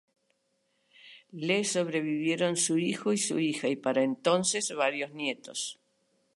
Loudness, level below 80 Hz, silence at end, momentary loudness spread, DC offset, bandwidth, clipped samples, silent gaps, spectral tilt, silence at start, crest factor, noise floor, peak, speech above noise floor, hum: -29 LUFS; -82 dBFS; 0.6 s; 9 LU; under 0.1%; 11.5 kHz; under 0.1%; none; -3.5 dB/octave; 1.05 s; 20 dB; -75 dBFS; -10 dBFS; 46 dB; none